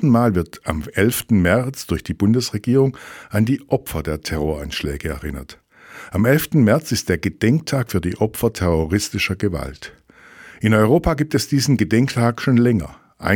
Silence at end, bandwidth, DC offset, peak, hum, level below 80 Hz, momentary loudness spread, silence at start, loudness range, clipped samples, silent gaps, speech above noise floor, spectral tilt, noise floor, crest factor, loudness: 0 s; 19 kHz; under 0.1%; 0 dBFS; none; -38 dBFS; 11 LU; 0 s; 4 LU; under 0.1%; none; 26 dB; -6 dB/octave; -44 dBFS; 18 dB; -19 LUFS